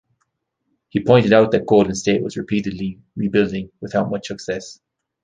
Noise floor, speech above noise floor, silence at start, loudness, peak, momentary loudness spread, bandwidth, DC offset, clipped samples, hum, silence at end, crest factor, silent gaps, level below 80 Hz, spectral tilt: -73 dBFS; 55 dB; 0.95 s; -19 LUFS; -2 dBFS; 14 LU; 9.6 kHz; under 0.1%; under 0.1%; none; 0.5 s; 18 dB; none; -50 dBFS; -6 dB/octave